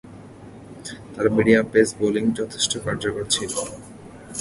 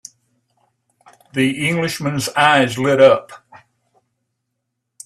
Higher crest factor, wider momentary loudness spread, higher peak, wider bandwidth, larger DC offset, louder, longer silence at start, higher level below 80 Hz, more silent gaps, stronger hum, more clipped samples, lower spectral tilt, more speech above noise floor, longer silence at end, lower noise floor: about the same, 22 dB vs 20 dB; first, 25 LU vs 9 LU; about the same, -2 dBFS vs 0 dBFS; second, 11.5 kHz vs 14 kHz; neither; second, -21 LUFS vs -16 LUFS; second, 0.05 s vs 1.35 s; first, -52 dBFS vs -60 dBFS; neither; neither; neither; about the same, -4 dB/octave vs -4.5 dB/octave; second, 20 dB vs 60 dB; second, 0 s vs 1.7 s; second, -42 dBFS vs -76 dBFS